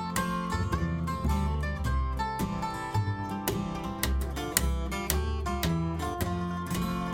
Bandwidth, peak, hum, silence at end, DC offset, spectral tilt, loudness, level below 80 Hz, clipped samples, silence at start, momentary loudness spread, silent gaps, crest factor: 16.5 kHz; -6 dBFS; none; 0 s; under 0.1%; -5 dB/octave; -31 LUFS; -34 dBFS; under 0.1%; 0 s; 3 LU; none; 24 dB